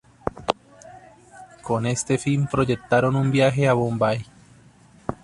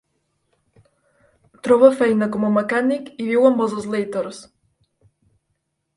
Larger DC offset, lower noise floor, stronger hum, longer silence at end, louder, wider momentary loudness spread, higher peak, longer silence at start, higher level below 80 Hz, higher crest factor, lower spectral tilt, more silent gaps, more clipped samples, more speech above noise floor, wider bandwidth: neither; second, -52 dBFS vs -73 dBFS; neither; second, 0.1 s vs 1.55 s; second, -22 LUFS vs -18 LUFS; about the same, 12 LU vs 14 LU; about the same, -2 dBFS vs 0 dBFS; second, 0.25 s vs 1.65 s; first, -50 dBFS vs -64 dBFS; about the same, 20 dB vs 20 dB; about the same, -6 dB/octave vs -6.5 dB/octave; neither; neither; second, 31 dB vs 56 dB; about the same, 11.5 kHz vs 11.5 kHz